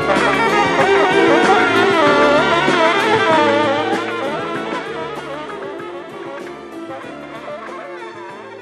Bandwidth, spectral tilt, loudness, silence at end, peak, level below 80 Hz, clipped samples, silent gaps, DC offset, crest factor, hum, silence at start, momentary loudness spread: 13.5 kHz; -4.5 dB/octave; -14 LUFS; 0 s; 0 dBFS; -50 dBFS; under 0.1%; none; under 0.1%; 16 dB; none; 0 s; 18 LU